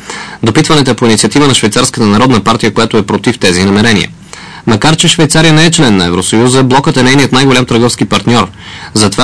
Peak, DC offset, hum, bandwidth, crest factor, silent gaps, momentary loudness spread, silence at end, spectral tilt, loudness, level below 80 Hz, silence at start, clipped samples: 0 dBFS; 3%; none; 11 kHz; 8 dB; none; 7 LU; 0 s; -4.5 dB/octave; -7 LUFS; -34 dBFS; 0 s; 1%